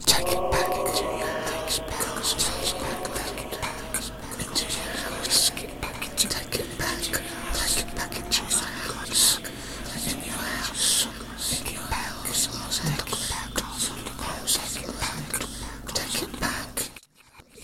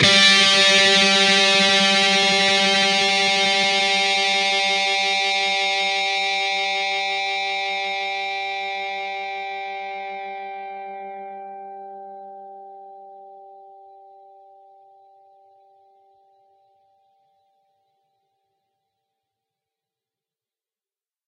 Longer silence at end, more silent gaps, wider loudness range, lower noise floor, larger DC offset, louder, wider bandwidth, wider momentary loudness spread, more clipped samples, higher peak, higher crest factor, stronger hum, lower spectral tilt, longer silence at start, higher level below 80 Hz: second, 0 s vs 7.6 s; neither; second, 4 LU vs 22 LU; second, -53 dBFS vs under -90 dBFS; neither; second, -26 LUFS vs -17 LUFS; first, 17 kHz vs 12 kHz; second, 10 LU vs 22 LU; neither; about the same, -4 dBFS vs -2 dBFS; about the same, 24 dB vs 20 dB; neither; about the same, -1.5 dB/octave vs -1.5 dB/octave; about the same, 0 s vs 0 s; first, -42 dBFS vs -66 dBFS